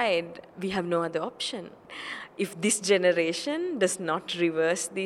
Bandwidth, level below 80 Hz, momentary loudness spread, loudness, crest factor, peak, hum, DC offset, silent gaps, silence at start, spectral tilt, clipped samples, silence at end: 15.5 kHz; -70 dBFS; 14 LU; -28 LUFS; 18 dB; -10 dBFS; none; under 0.1%; none; 0 s; -3.5 dB/octave; under 0.1%; 0 s